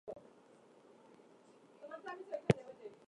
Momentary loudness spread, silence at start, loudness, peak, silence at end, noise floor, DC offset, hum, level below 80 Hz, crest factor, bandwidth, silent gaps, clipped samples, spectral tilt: 27 LU; 0.05 s; -40 LUFS; -12 dBFS; 0.15 s; -64 dBFS; under 0.1%; none; -70 dBFS; 32 dB; 11 kHz; none; under 0.1%; -7 dB/octave